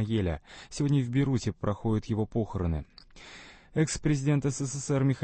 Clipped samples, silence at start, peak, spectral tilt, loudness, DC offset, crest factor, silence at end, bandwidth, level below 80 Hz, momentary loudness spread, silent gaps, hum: under 0.1%; 0 s; -14 dBFS; -6.5 dB/octave; -30 LUFS; under 0.1%; 16 dB; 0 s; 8.8 kHz; -46 dBFS; 20 LU; none; none